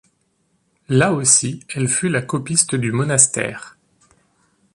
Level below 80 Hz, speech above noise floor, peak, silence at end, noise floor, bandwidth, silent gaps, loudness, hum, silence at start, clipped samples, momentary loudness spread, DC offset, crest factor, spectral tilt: -56 dBFS; 47 dB; 0 dBFS; 1.05 s; -65 dBFS; 11.5 kHz; none; -17 LUFS; none; 0.9 s; under 0.1%; 11 LU; under 0.1%; 20 dB; -3.5 dB/octave